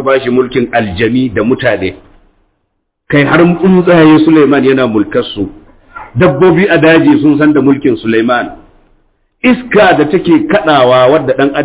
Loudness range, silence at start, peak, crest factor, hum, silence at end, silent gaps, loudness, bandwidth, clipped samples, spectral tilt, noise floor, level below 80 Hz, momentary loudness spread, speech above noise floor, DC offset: 3 LU; 0 s; 0 dBFS; 8 dB; none; 0 s; none; -8 LUFS; 4 kHz; 0.1%; -10.5 dB/octave; -65 dBFS; -38 dBFS; 8 LU; 57 dB; under 0.1%